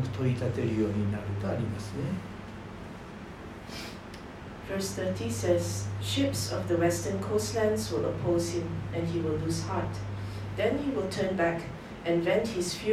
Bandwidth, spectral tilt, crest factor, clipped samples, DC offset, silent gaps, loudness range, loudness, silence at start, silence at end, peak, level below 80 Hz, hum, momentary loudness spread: 15 kHz; -5.5 dB/octave; 18 dB; under 0.1%; under 0.1%; none; 8 LU; -31 LUFS; 0 s; 0 s; -12 dBFS; -52 dBFS; none; 15 LU